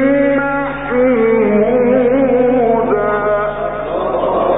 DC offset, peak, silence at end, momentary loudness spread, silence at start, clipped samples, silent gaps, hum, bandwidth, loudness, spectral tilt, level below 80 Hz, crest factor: 0.9%; -2 dBFS; 0 s; 7 LU; 0 s; under 0.1%; none; none; 3.9 kHz; -14 LUFS; -11.5 dB/octave; -38 dBFS; 12 dB